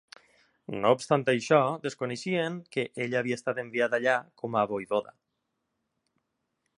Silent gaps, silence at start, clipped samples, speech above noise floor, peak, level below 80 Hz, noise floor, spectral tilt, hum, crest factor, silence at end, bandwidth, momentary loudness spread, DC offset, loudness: none; 0.7 s; under 0.1%; 53 dB; -8 dBFS; -74 dBFS; -81 dBFS; -5.5 dB/octave; none; 22 dB; 1.7 s; 11 kHz; 9 LU; under 0.1%; -28 LUFS